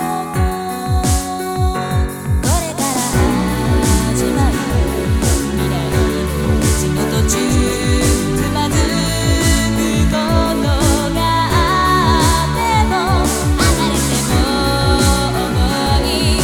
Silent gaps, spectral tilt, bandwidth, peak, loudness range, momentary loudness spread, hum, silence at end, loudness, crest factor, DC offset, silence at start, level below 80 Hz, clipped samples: none; -4.5 dB/octave; 18 kHz; 0 dBFS; 2 LU; 5 LU; none; 0 s; -15 LUFS; 14 dB; under 0.1%; 0 s; -22 dBFS; under 0.1%